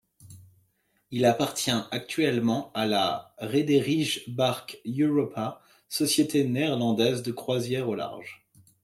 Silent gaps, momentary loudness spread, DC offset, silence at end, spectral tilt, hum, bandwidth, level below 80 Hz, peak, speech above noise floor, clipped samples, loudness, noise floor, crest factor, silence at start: none; 11 LU; under 0.1%; 0.5 s; -4.5 dB/octave; none; 16 kHz; -68 dBFS; -10 dBFS; 44 dB; under 0.1%; -27 LUFS; -70 dBFS; 18 dB; 0.25 s